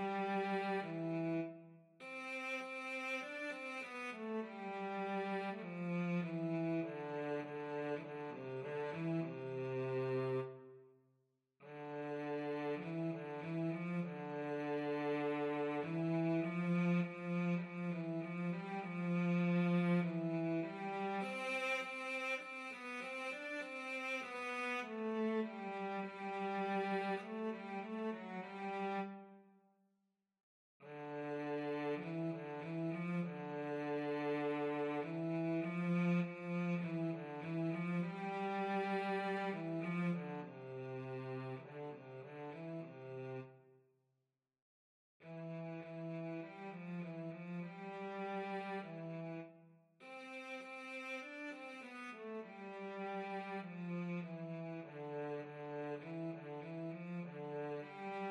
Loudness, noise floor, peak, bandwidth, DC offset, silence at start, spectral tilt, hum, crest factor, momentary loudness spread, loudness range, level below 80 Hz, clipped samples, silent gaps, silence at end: -42 LUFS; -88 dBFS; -26 dBFS; 10.5 kHz; under 0.1%; 0 s; -7.5 dB/octave; none; 16 dB; 10 LU; 10 LU; under -90 dBFS; under 0.1%; 30.40-30.80 s, 44.62-45.20 s; 0 s